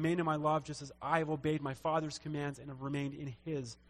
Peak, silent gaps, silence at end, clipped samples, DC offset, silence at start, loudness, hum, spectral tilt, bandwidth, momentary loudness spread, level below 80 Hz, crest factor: -16 dBFS; none; 0.15 s; under 0.1%; under 0.1%; 0 s; -37 LUFS; none; -6 dB/octave; 12.5 kHz; 9 LU; -64 dBFS; 20 dB